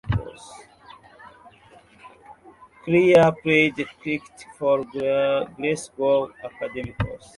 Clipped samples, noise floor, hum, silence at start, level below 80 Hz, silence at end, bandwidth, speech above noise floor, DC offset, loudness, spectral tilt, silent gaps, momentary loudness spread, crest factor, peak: under 0.1%; -52 dBFS; none; 0.05 s; -46 dBFS; 0.2 s; 11.5 kHz; 30 dB; under 0.1%; -22 LUFS; -6 dB/octave; none; 17 LU; 22 dB; -2 dBFS